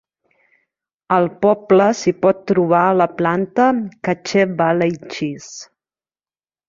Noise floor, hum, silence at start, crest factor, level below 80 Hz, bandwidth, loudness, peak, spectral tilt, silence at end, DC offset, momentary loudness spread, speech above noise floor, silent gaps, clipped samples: under -90 dBFS; none; 1.1 s; 16 dB; -60 dBFS; 7.6 kHz; -17 LUFS; -2 dBFS; -6 dB/octave; 1.05 s; under 0.1%; 11 LU; over 74 dB; none; under 0.1%